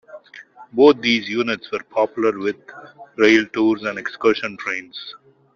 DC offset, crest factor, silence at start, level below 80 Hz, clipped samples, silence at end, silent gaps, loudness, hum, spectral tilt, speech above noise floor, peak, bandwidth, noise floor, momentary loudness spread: under 0.1%; 18 dB; 0.15 s; -62 dBFS; under 0.1%; 0.4 s; none; -19 LUFS; none; -4.5 dB/octave; 24 dB; -2 dBFS; 7.2 kHz; -43 dBFS; 19 LU